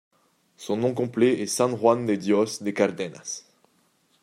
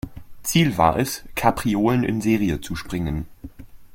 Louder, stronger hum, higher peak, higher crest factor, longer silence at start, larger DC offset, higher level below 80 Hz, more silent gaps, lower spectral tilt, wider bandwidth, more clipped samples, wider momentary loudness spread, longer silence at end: about the same, -24 LUFS vs -22 LUFS; neither; second, -6 dBFS vs -2 dBFS; about the same, 20 dB vs 20 dB; first, 0.6 s vs 0.05 s; neither; second, -72 dBFS vs -40 dBFS; neither; about the same, -5 dB/octave vs -5.5 dB/octave; about the same, 16 kHz vs 16.5 kHz; neither; about the same, 13 LU vs 12 LU; first, 0.85 s vs 0.05 s